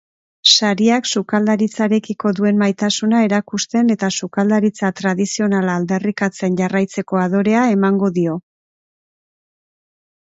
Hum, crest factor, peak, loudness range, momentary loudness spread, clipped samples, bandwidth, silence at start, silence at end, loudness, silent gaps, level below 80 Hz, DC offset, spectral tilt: none; 18 dB; 0 dBFS; 3 LU; 6 LU; under 0.1%; 8 kHz; 0.45 s; 1.85 s; -16 LUFS; none; -62 dBFS; under 0.1%; -4.5 dB/octave